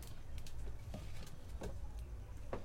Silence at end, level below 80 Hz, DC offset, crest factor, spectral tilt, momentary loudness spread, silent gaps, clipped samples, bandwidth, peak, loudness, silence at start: 0 s; -48 dBFS; under 0.1%; 16 dB; -5.5 dB/octave; 3 LU; none; under 0.1%; 16 kHz; -28 dBFS; -51 LUFS; 0 s